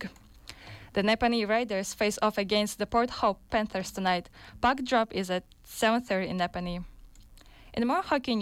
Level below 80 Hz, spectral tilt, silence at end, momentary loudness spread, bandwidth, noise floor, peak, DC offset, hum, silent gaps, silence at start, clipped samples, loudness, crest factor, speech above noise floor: -52 dBFS; -4.5 dB/octave; 0 s; 16 LU; 16.5 kHz; -52 dBFS; -14 dBFS; under 0.1%; none; none; 0 s; under 0.1%; -29 LUFS; 16 dB; 24 dB